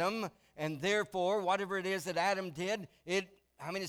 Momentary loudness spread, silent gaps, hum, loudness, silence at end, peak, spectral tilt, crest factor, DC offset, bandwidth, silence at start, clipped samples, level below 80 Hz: 9 LU; none; none; -35 LUFS; 0 s; -20 dBFS; -4 dB/octave; 16 dB; under 0.1%; 18.5 kHz; 0 s; under 0.1%; -74 dBFS